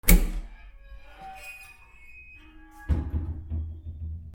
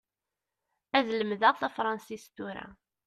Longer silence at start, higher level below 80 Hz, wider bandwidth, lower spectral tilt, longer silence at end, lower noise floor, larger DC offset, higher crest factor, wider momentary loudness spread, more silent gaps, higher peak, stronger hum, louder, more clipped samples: second, 0.05 s vs 0.95 s; first, -30 dBFS vs -72 dBFS; first, 18 kHz vs 13.5 kHz; about the same, -4.5 dB/octave vs -4.5 dB/octave; second, 0 s vs 0.35 s; second, -49 dBFS vs -89 dBFS; neither; first, 28 dB vs 22 dB; first, 21 LU vs 18 LU; neither; first, -2 dBFS vs -10 dBFS; neither; about the same, -31 LUFS vs -29 LUFS; neither